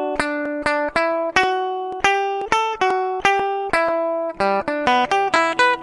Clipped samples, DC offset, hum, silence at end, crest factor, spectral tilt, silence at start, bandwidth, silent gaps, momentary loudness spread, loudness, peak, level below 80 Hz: under 0.1%; under 0.1%; none; 0 s; 20 dB; -3 dB/octave; 0 s; 11.5 kHz; none; 5 LU; -19 LUFS; 0 dBFS; -50 dBFS